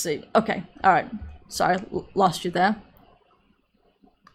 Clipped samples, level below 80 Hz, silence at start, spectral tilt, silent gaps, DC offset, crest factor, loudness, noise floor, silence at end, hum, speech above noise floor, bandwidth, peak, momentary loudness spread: under 0.1%; -52 dBFS; 0 s; -4.5 dB/octave; none; under 0.1%; 22 dB; -24 LUFS; -65 dBFS; 1.55 s; none; 42 dB; 16 kHz; -4 dBFS; 14 LU